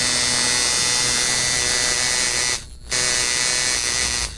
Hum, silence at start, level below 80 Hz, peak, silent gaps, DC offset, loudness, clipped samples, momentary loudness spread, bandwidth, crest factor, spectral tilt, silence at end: none; 0 s; -40 dBFS; -4 dBFS; none; under 0.1%; -17 LUFS; under 0.1%; 4 LU; 11.5 kHz; 16 dB; 0 dB/octave; 0 s